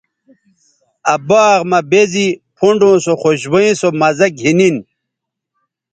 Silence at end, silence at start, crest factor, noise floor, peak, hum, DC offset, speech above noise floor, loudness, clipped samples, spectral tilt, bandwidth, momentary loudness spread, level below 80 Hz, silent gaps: 1.1 s; 1.05 s; 14 dB; -78 dBFS; 0 dBFS; none; under 0.1%; 67 dB; -12 LUFS; under 0.1%; -5 dB/octave; 9.2 kHz; 7 LU; -58 dBFS; none